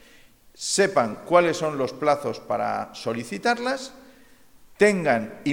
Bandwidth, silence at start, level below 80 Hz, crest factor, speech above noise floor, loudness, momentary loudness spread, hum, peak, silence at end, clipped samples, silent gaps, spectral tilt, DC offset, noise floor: 17 kHz; 0.6 s; -62 dBFS; 20 dB; 30 dB; -24 LUFS; 10 LU; none; -4 dBFS; 0 s; under 0.1%; none; -4 dB/octave; under 0.1%; -53 dBFS